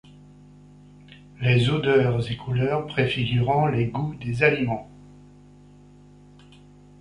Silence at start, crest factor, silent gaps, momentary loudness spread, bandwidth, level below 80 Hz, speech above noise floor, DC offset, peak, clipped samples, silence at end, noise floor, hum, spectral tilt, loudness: 1.1 s; 20 dB; none; 8 LU; 10 kHz; -50 dBFS; 27 dB; under 0.1%; -4 dBFS; under 0.1%; 1.95 s; -50 dBFS; 50 Hz at -40 dBFS; -7.5 dB/octave; -23 LUFS